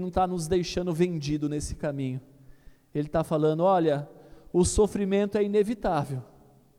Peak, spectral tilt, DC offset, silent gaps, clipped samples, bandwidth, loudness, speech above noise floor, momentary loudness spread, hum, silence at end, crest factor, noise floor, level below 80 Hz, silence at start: -10 dBFS; -6 dB/octave; under 0.1%; none; under 0.1%; 15.5 kHz; -27 LUFS; 26 dB; 11 LU; none; 0.55 s; 16 dB; -51 dBFS; -44 dBFS; 0 s